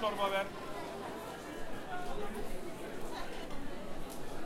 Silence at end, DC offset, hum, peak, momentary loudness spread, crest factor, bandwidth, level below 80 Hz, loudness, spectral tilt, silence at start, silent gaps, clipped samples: 0 s; under 0.1%; none; -20 dBFS; 11 LU; 16 dB; 16 kHz; -48 dBFS; -41 LUFS; -4 dB/octave; 0 s; none; under 0.1%